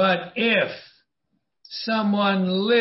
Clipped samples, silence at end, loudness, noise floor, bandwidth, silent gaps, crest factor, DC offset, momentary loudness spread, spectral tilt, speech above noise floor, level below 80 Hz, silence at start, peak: under 0.1%; 0 s; -22 LUFS; -75 dBFS; 6 kHz; none; 16 dB; under 0.1%; 12 LU; -8.5 dB/octave; 53 dB; -70 dBFS; 0 s; -8 dBFS